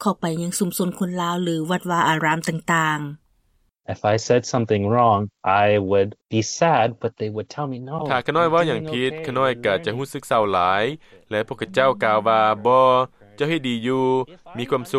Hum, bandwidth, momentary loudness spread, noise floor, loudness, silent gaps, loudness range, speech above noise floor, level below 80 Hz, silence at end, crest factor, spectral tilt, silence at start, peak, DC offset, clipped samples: none; 16.5 kHz; 11 LU; -64 dBFS; -21 LUFS; none; 3 LU; 44 dB; -60 dBFS; 0 s; 16 dB; -5 dB/octave; 0 s; -4 dBFS; under 0.1%; under 0.1%